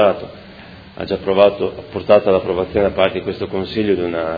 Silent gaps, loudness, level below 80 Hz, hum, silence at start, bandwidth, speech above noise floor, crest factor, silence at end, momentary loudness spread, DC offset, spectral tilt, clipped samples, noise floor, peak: none; -17 LUFS; -44 dBFS; none; 0 s; 5 kHz; 22 dB; 18 dB; 0 s; 17 LU; under 0.1%; -8.5 dB/octave; under 0.1%; -38 dBFS; 0 dBFS